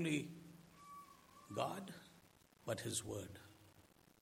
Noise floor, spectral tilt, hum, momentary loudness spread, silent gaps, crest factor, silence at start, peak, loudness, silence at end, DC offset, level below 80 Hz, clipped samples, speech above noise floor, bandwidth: -69 dBFS; -4 dB/octave; none; 22 LU; none; 24 dB; 0 s; -24 dBFS; -46 LUFS; 0.35 s; under 0.1%; -78 dBFS; under 0.1%; 25 dB; 16.5 kHz